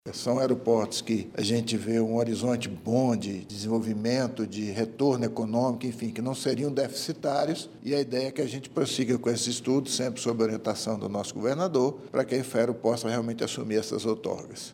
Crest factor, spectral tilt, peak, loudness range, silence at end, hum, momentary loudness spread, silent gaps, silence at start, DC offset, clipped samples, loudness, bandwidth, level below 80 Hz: 18 dB; -5 dB/octave; -10 dBFS; 1 LU; 0 s; none; 6 LU; none; 0.05 s; under 0.1%; under 0.1%; -28 LUFS; 16.5 kHz; -68 dBFS